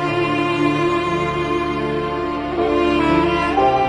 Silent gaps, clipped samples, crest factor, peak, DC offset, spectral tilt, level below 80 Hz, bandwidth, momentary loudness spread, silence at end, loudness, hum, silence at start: none; under 0.1%; 14 dB; -4 dBFS; under 0.1%; -6.5 dB/octave; -38 dBFS; 10.5 kHz; 6 LU; 0 s; -18 LUFS; none; 0 s